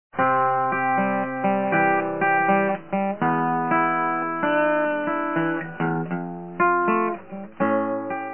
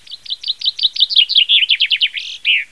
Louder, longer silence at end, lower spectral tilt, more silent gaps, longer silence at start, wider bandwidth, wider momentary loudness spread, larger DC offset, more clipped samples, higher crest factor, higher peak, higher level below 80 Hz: second, -22 LUFS vs -12 LUFS; about the same, 0 s vs 0.05 s; first, -10.5 dB/octave vs 4 dB/octave; neither; about the same, 0.15 s vs 0.1 s; second, 3.3 kHz vs 11 kHz; second, 7 LU vs 11 LU; about the same, 0.4% vs 0.4%; neither; about the same, 16 dB vs 16 dB; second, -8 dBFS vs 0 dBFS; about the same, -70 dBFS vs -66 dBFS